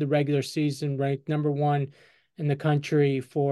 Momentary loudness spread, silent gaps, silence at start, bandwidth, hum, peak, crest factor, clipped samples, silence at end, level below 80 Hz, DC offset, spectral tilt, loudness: 5 LU; none; 0 s; 12.5 kHz; none; -12 dBFS; 14 dB; under 0.1%; 0 s; -72 dBFS; under 0.1%; -7.5 dB/octave; -26 LUFS